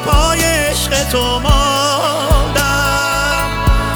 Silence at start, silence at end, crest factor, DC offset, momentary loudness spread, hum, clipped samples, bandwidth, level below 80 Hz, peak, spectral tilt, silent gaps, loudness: 0 s; 0 s; 14 dB; under 0.1%; 3 LU; none; under 0.1%; over 20 kHz; -18 dBFS; 0 dBFS; -3.5 dB/octave; none; -14 LUFS